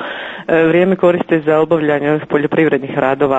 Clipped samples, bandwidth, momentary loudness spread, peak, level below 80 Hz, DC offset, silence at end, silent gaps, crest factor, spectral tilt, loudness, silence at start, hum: under 0.1%; 8 kHz; 5 LU; 0 dBFS; -52 dBFS; under 0.1%; 0 s; none; 12 dB; -8.5 dB/octave; -14 LUFS; 0 s; none